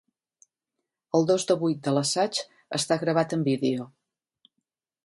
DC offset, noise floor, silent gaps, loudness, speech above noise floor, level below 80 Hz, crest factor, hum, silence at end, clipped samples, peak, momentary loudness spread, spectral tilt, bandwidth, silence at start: under 0.1%; -85 dBFS; none; -26 LUFS; 60 dB; -72 dBFS; 20 dB; none; 1.2 s; under 0.1%; -8 dBFS; 9 LU; -4.5 dB/octave; 11.5 kHz; 1.15 s